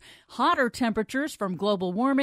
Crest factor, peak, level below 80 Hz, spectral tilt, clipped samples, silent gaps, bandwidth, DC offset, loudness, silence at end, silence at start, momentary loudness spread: 14 dB; -12 dBFS; -60 dBFS; -5 dB/octave; under 0.1%; none; 15 kHz; under 0.1%; -26 LUFS; 0 s; 0.05 s; 7 LU